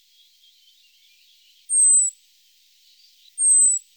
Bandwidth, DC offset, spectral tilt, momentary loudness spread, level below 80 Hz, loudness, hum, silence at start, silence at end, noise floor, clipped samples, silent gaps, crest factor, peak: over 20 kHz; under 0.1%; 8.5 dB/octave; 10 LU; under -90 dBFS; -15 LUFS; 50 Hz at -95 dBFS; 1.7 s; 0.2 s; -58 dBFS; under 0.1%; none; 14 dB; -10 dBFS